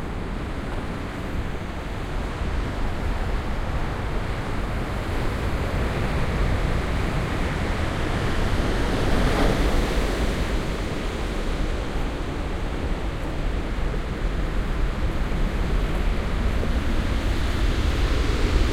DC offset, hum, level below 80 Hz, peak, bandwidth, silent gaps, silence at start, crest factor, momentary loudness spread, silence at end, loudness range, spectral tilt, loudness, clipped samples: under 0.1%; none; -26 dBFS; -6 dBFS; 14.5 kHz; none; 0 s; 18 dB; 7 LU; 0 s; 5 LU; -6 dB/octave; -27 LUFS; under 0.1%